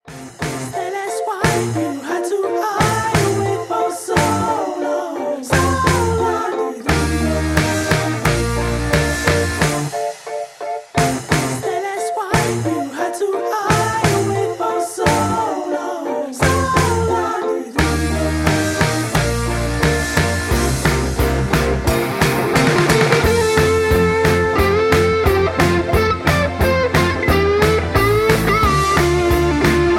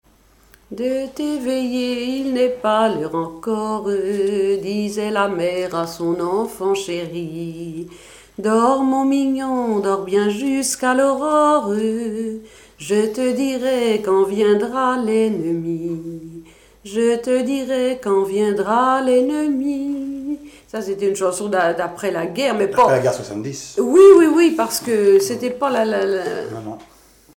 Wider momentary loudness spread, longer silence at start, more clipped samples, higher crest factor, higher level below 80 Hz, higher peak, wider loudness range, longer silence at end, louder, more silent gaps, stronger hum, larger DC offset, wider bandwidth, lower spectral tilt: second, 8 LU vs 12 LU; second, 0.05 s vs 0.7 s; neither; about the same, 16 dB vs 16 dB; first, -28 dBFS vs -56 dBFS; about the same, -2 dBFS vs -2 dBFS; second, 4 LU vs 7 LU; second, 0 s vs 0.5 s; about the same, -17 LUFS vs -18 LUFS; neither; neither; neither; about the same, 16.5 kHz vs 17.5 kHz; about the same, -5 dB/octave vs -5 dB/octave